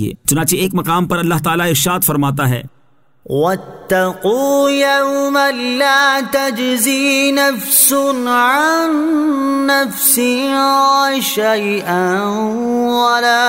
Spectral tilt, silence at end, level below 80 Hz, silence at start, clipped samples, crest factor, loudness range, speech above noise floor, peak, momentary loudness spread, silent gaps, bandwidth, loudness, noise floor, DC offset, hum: -3.5 dB/octave; 0 s; -50 dBFS; 0 s; under 0.1%; 14 dB; 4 LU; 43 dB; 0 dBFS; 6 LU; none; 16.5 kHz; -13 LUFS; -57 dBFS; 0.1%; none